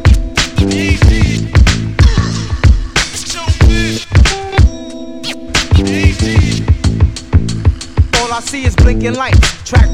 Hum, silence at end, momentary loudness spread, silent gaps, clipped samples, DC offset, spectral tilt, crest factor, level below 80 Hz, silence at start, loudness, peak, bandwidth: none; 0 s; 6 LU; none; 0.2%; under 0.1%; -5 dB/octave; 10 dB; -14 dBFS; 0 s; -12 LUFS; 0 dBFS; 12 kHz